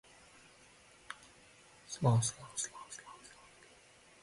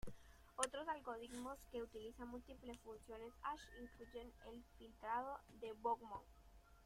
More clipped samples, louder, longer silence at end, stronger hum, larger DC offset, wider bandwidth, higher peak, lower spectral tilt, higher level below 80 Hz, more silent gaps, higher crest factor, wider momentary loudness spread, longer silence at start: neither; first, -36 LUFS vs -50 LUFS; first, 1.05 s vs 0 s; neither; neither; second, 11.5 kHz vs 16 kHz; first, -20 dBFS vs -24 dBFS; first, -4.5 dB/octave vs -3 dB/octave; about the same, -70 dBFS vs -68 dBFS; neither; second, 20 dB vs 28 dB; first, 28 LU vs 15 LU; first, 1.1 s vs 0 s